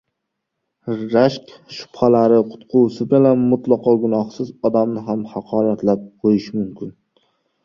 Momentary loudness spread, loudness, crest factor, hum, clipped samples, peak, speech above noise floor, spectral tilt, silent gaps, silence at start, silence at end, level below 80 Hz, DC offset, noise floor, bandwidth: 17 LU; -18 LUFS; 16 dB; none; under 0.1%; -2 dBFS; 60 dB; -8.5 dB/octave; none; 0.85 s; 0.75 s; -58 dBFS; under 0.1%; -77 dBFS; 7.2 kHz